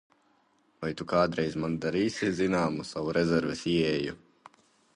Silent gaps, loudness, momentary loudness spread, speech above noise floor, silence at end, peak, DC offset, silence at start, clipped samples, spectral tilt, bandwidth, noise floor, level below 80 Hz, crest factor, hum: none; -29 LUFS; 10 LU; 39 dB; 0.8 s; -12 dBFS; under 0.1%; 0.8 s; under 0.1%; -6 dB/octave; 11 kHz; -68 dBFS; -56 dBFS; 18 dB; none